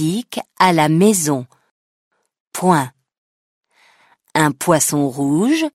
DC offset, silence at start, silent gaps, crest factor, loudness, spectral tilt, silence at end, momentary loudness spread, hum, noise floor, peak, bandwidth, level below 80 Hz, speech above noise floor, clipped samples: under 0.1%; 0 s; 1.71-2.11 s, 2.40-2.51 s, 3.18-3.61 s; 18 dB; -16 LUFS; -4.5 dB/octave; 0.05 s; 11 LU; none; -55 dBFS; 0 dBFS; 16 kHz; -60 dBFS; 39 dB; under 0.1%